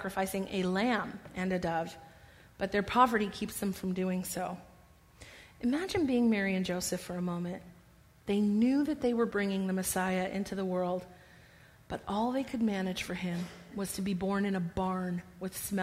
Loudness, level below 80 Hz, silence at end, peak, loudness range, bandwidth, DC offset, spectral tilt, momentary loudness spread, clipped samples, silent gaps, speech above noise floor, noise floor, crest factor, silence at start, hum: -33 LUFS; -58 dBFS; 0 s; -12 dBFS; 3 LU; 16 kHz; under 0.1%; -5.5 dB/octave; 13 LU; under 0.1%; none; 28 dB; -60 dBFS; 22 dB; 0 s; none